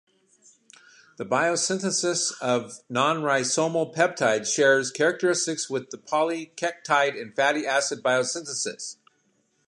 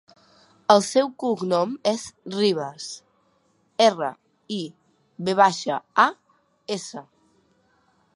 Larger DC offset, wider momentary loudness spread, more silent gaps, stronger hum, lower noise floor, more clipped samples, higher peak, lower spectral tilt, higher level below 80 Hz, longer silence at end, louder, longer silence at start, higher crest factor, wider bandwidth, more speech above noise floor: neither; second, 9 LU vs 17 LU; neither; neither; first, -69 dBFS vs -65 dBFS; neither; second, -6 dBFS vs -2 dBFS; second, -2.5 dB/octave vs -4 dB/octave; about the same, -78 dBFS vs -74 dBFS; second, 0.75 s vs 1.15 s; about the same, -24 LUFS vs -23 LUFS; first, 1.2 s vs 0.7 s; second, 18 dB vs 24 dB; about the same, 11.5 kHz vs 11.5 kHz; about the same, 44 dB vs 43 dB